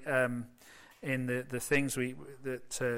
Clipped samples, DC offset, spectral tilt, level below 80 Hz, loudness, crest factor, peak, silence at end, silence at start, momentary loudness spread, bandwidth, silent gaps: under 0.1%; under 0.1%; -5 dB/octave; -60 dBFS; -34 LUFS; 18 dB; -16 dBFS; 0 s; 0 s; 13 LU; 16.5 kHz; none